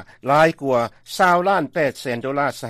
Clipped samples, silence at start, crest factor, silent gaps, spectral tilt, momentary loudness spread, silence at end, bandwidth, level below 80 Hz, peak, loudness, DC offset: under 0.1%; 0 s; 16 dB; none; -5 dB/octave; 7 LU; 0 s; 15 kHz; -58 dBFS; -4 dBFS; -19 LUFS; under 0.1%